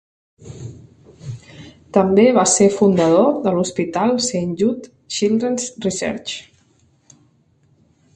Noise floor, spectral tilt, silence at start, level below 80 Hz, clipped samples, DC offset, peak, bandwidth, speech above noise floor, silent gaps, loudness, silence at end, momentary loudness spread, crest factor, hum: -58 dBFS; -4.5 dB/octave; 0.45 s; -54 dBFS; under 0.1%; under 0.1%; 0 dBFS; 11.5 kHz; 41 dB; none; -17 LUFS; 1.75 s; 22 LU; 18 dB; none